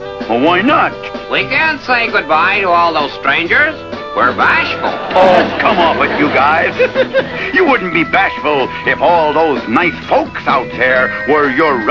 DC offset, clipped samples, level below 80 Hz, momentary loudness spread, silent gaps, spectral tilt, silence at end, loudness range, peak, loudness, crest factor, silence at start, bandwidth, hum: 0.3%; 0.1%; -42 dBFS; 5 LU; none; -5.5 dB/octave; 0 s; 1 LU; 0 dBFS; -12 LUFS; 12 dB; 0 s; 8 kHz; none